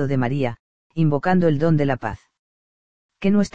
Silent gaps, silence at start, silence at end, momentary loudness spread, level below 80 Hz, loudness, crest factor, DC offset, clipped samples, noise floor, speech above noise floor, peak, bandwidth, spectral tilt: 0.60-0.90 s, 2.39-3.09 s; 0 s; 0 s; 14 LU; -48 dBFS; -21 LUFS; 16 dB; 2%; under 0.1%; under -90 dBFS; over 71 dB; -4 dBFS; 8.2 kHz; -8 dB/octave